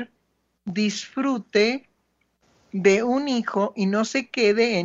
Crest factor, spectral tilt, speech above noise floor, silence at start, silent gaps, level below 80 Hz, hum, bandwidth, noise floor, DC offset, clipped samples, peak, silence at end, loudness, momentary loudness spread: 18 dB; -5 dB/octave; 49 dB; 0 s; none; -72 dBFS; none; 8 kHz; -71 dBFS; under 0.1%; under 0.1%; -4 dBFS; 0 s; -23 LUFS; 12 LU